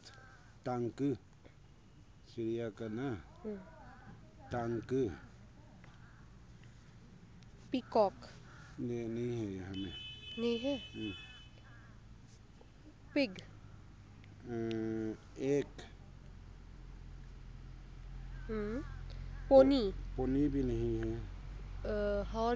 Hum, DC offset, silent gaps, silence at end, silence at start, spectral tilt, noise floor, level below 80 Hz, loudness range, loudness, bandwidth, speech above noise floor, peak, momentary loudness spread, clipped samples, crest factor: none; under 0.1%; none; 0 s; 0 s; -7 dB/octave; -60 dBFS; -50 dBFS; 11 LU; -37 LUFS; 8 kHz; 25 dB; -12 dBFS; 24 LU; under 0.1%; 26 dB